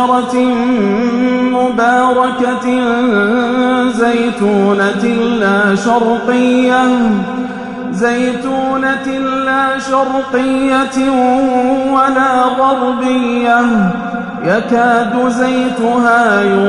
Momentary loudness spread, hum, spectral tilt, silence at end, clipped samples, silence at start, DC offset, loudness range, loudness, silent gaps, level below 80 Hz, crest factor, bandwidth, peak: 5 LU; none; -5.5 dB/octave; 0 s; under 0.1%; 0 s; under 0.1%; 2 LU; -12 LUFS; none; -46 dBFS; 12 dB; 11 kHz; 0 dBFS